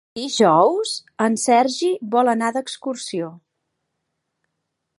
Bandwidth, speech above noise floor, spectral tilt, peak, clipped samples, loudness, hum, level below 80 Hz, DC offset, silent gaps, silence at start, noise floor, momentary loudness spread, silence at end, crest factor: 11.5 kHz; 58 dB; -4 dB/octave; -2 dBFS; under 0.1%; -19 LUFS; none; -74 dBFS; under 0.1%; none; 0.15 s; -77 dBFS; 12 LU; 1.6 s; 18 dB